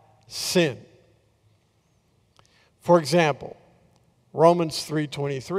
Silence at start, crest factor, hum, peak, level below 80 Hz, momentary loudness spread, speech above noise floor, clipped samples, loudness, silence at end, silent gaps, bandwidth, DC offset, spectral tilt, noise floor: 0.3 s; 20 dB; none; -4 dBFS; -66 dBFS; 18 LU; 43 dB; under 0.1%; -23 LUFS; 0 s; none; 16 kHz; under 0.1%; -5 dB/octave; -65 dBFS